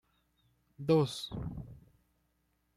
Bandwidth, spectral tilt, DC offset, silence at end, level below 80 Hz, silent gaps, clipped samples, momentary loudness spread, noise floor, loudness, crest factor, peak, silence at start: 15 kHz; -6.5 dB/octave; under 0.1%; 1 s; -58 dBFS; none; under 0.1%; 18 LU; -77 dBFS; -33 LUFS; 20 dB; -16 dBFS; 0.8 s